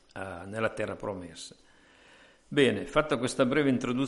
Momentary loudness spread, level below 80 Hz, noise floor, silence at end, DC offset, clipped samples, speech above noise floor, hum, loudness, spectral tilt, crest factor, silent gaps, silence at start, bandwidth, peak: 15 LU; -56 dBFS; -58 dBFS; 0 s; under 0.1%; under 0.1%; 29 dB; none; -29 LUFS; -5 dB/octave; 20 dB; none; 0.15 s; 11.5 kHz; -10 dBFS